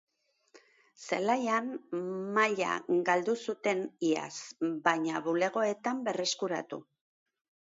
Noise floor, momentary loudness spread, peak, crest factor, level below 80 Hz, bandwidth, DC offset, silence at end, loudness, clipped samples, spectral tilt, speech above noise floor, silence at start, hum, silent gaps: -64 dBFS; 9 LU; -12 dBFS; 20 dB; -82 dBFS; 8 kHz; under 0.1%; 0.9 s; -31 LUFS; under 0.1%; -4 dB/octave; 33 dB; 0.55 s; none; none